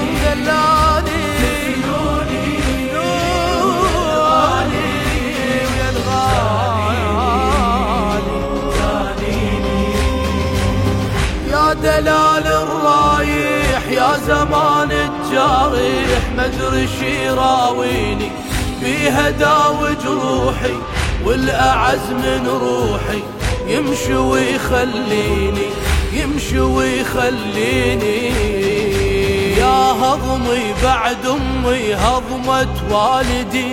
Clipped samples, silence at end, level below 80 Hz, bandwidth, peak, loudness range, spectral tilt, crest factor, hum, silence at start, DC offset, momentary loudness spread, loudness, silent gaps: under 0.1%; 0 s; -26 dBFS; 16.5 kHz; -2 dBFS; 3 LU; -5 dB/octave; 14 dB; none; 0 s; under 0.1%; 5 LU; -16 LUFS; none